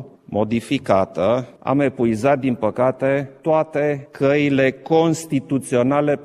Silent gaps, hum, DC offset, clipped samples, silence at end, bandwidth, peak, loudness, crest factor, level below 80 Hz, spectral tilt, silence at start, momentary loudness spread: none; none; under 0.1%; under 0.1%; 0 s; 14 kHz; -2 dBFS; -19 LUFS; 16 dB; -56 dBFS; -6.5 dB/octave; 0 s; 5 LU